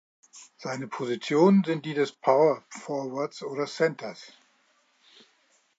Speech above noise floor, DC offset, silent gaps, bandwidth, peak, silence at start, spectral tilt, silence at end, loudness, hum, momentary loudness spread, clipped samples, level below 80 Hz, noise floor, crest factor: 41 dB; under 0.1%; none; 8 kHz; -8 dBFS; 0.35 s; -6.5 dB/octave; 1.5 s; -26 LUFS; none; 16 LU; under 0.1%; -84 dBFS; -67 dBFS; 20 dB